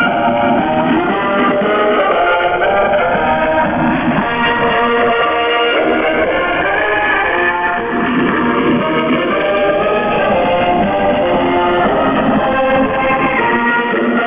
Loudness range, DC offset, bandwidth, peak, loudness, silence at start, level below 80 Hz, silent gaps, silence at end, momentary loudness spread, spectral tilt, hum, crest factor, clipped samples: 1 LU; under 0.1%; 3.8 kHz; -4 dBFS; -13 LUFS; 0 s; -38 dBFS; none; 0 s; 2 LU; -9 dB/octave; none; 10 dB; under 0.1%